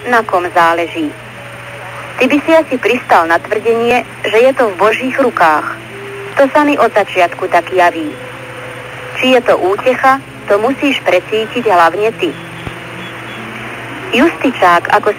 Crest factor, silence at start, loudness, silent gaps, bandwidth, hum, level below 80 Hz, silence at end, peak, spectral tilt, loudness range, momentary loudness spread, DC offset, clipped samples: 12 dB; 0 s; -12 LUFS; none; 16 kHz; none; -48 dBFS; 0 s; 0 dBFS; -4.5 dB/octave; 3 LU; 16 LU; under 0.1%; under 0.1%